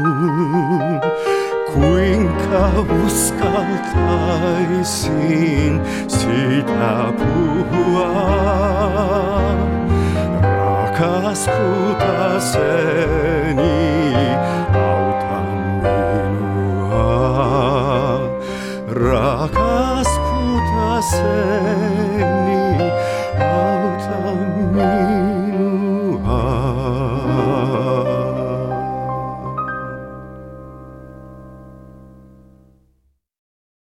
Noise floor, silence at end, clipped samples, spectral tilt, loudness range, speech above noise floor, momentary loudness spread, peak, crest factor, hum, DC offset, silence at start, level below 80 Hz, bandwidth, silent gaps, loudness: -62 dBFS; 1.8 s; under 0.1%; -6 dB/octave; 4 LU; 46 dB; 6 LU; -2 dBFS; 16 dB; none; under 0.1%; 0 s; -30 dBFS; 16 kHz; none; -17 LUFS